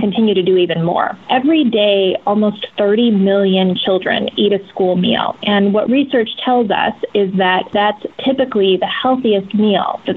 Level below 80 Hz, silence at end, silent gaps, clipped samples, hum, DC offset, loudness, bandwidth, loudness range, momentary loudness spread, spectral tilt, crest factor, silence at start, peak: -56 dBFS; 0 s; none; under 0.1%; none; under 0.1%; -14 LUFS; 4.3 kHz; 1 LU; 4 LU; -8.5 dB/octave; 12 dB; 0 s; -2 dBFS